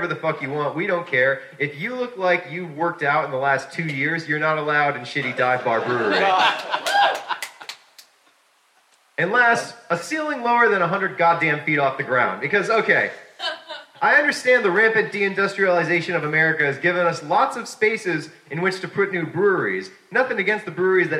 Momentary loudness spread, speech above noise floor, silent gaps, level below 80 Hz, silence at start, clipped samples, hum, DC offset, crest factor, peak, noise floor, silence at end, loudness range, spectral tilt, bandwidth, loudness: 10 LU; 39 dB; none; -78 dBFS; 0 s; under 0.1%; none; under 0.1%; 18 dB; -4 dBFS; -60 dBFS; 0 s; 4 LU; -4.5 dB/octave; 15.5 kHz; -20 LUFS